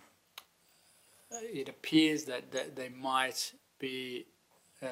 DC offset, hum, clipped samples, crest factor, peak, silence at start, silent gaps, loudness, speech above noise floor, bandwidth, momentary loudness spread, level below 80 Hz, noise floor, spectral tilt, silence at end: under 0.1%; none; under 0.1%; 22 dB; -14 dBFS; 0.35 s; none; -35 LUFS; 33 dB; 16 kHz; 21 LU; -86 dBFS; -68 dBFS; -3 dB/octave; 0 s